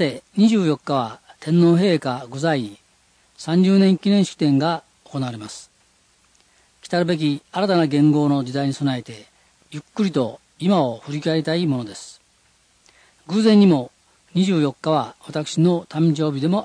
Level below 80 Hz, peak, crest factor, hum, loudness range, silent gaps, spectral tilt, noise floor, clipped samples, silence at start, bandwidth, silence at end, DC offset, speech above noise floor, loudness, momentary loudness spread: -66 dBFS; -4 dBFS; 16 dB; none; 4 LU; none; -7 dB/octave; -59 dBFS; under 0.1%; 0 s; 10.5 kHz; 0 s; under 0.1%; 41 dB; -20 LUFS; 17 LU